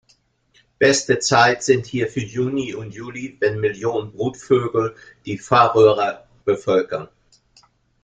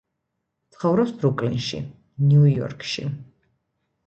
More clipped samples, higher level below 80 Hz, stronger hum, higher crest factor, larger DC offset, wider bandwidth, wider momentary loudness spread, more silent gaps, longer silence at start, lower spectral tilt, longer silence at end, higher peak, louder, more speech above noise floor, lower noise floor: neither; about the same, -56 dBFS vs -56 dBFS; neither; about the same, 18 dB vs 16 dB; neither; first, 9.4 kHz vs 7.8 kHz; about the same, 16 LU vs 16 LU; neither; about the same, 0.8 s vs 0.8 s; second, -4.5 dB/octave vs -7.5 dB/octave; first, 1 s vs 0.85 s; first, -2 dBFS vs -8 dBFS; first, -19 LUFS vs -22 LUFS; second, 42 dB vs 58 dB; second, -61 dBFS vs -78 dBFS